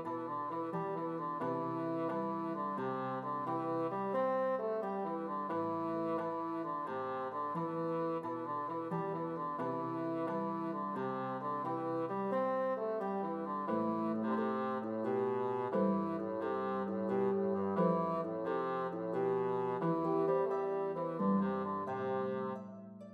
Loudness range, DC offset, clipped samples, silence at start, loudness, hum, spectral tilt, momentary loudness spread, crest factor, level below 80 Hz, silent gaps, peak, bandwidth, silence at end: 3 LU; under 0.1%; under 0.1%; 0 s; -37 LUFS; none; -9.5 dB/octave; 5 LU; 16 dB; -84 dBFS; none; -20 dBFS; 6.2 kHz; 0 s